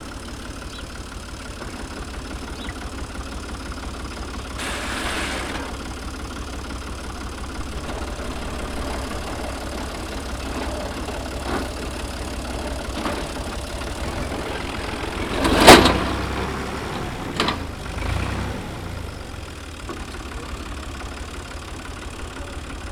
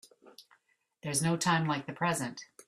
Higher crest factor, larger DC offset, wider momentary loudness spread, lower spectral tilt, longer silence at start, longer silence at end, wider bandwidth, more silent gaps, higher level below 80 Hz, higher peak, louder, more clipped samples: about the same, 24 dB vs 20 dB; neither; about the same, 10 LU vs 10 LU; about the same, -4 dB/octave vs -4 dB/octave; second, 0 s vs 0.25 s; about the same, 0 s vs 0.05 s; first, over 20 kHz vs 15 kHz; neither; first, -34 dBFS vs -70 dBFS; first, 0 dBFS vs -14 dBFS; first, -25 LUFS vs -31 LUFS; neither